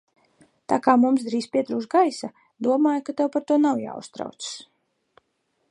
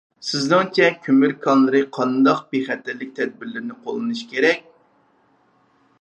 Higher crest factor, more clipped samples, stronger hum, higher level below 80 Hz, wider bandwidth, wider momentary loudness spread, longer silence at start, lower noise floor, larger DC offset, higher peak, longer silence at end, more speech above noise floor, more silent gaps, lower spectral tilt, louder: about the same, 20 dB vs 20 dB; neither; neither; about the same, -74 dBFS vs -76 dBFS; first, 11 kHz vs 8.6 kHz; first, 16 LU vs 12 LU; first, 0.7 s vs 0.2 s; first, -73 dBFS vs -60 dBFS; neither; about the same, -4 dBFS vs -2 dBFS; second, 1.1 s vs 1.4 s; first, 50 dB vs 41 dB; neither; about the same, -5 dB/octave vs -5 dB/octave; about the same, -22 LUFS vs -20 LUFS